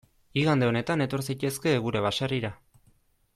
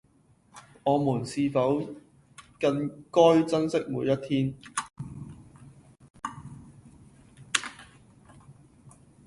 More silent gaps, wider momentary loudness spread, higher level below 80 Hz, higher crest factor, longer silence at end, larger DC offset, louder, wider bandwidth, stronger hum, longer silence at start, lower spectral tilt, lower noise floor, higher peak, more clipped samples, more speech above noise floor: second, none vs 6.10-6.14 s; second, 7 LU vs 21 LU; about the same, -58 dBFS vs -62 dBFS; second, 16 dB vs 26 dB; about the same, 0.8 s vs 0.75 s; neither; about the same, -27 LUFS vs -27 LUFS; first, 15 kHz vs 11.5 kHz; neither; second, 0.35 s vs 0.55 s; about the same, -5.5 dB/octave vs -5.5 dB/octave; about the same, -64 dBFS vs -62 dBFS; second, -12 dBFS vs -4 dBFS; neither; about the same, 38 dB vs 37 dB